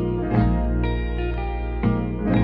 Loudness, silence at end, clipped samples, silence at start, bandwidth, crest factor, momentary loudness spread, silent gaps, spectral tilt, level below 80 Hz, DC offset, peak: -24 LUFS; 0 s; under 0.1%; 0 s; 5 kHz; 14 dB; 6 LU; none; -11 dB/octave; -26 dBFS; under 0.1%; -6 dBFS